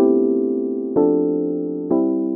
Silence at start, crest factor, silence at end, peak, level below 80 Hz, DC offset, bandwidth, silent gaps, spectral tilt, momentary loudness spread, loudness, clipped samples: 0 s; 14 dB; 0 s; -4 dBFS; -62 dBFS; under 0.1%; 1.9 kHz; none; -14 dB/octave; 6 LU; -19 LUFS; under 0.1%